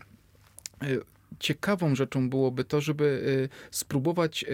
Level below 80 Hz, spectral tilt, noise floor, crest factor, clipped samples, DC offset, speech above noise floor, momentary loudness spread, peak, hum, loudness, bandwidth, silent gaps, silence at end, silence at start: -62 dBFS; -5.5 dB/octave; -58 dBFS; 16 dB; under 0.1%; under 0.1%; 30 dB; 7 LU; -14 dBFS; none; -28 LUFS; 17.5 kHz; none; 0 s; 0.8 s